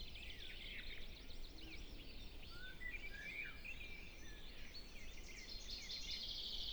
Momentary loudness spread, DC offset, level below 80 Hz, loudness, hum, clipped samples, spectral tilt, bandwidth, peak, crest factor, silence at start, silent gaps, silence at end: 11 LU; under 0.1%; -54 dBFS; -51 LUFS; none; under 0.1%; -2.5 dB/octave; over 20 kHz; -34 dBFS; 16 dB; 0 s; none; 0 s